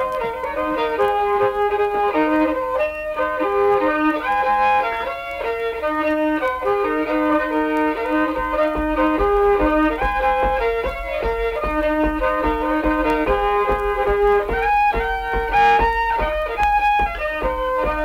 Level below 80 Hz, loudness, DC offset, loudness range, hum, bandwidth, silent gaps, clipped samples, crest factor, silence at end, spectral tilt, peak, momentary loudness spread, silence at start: -34 dBFS; -19 LUFS; under 0.1%; 2 LU; none; 16 kHz; none; under 0.1%; 14 dB; 0 s; -6.5 dB/octave; -4 dBFS; 6 LU; 0 s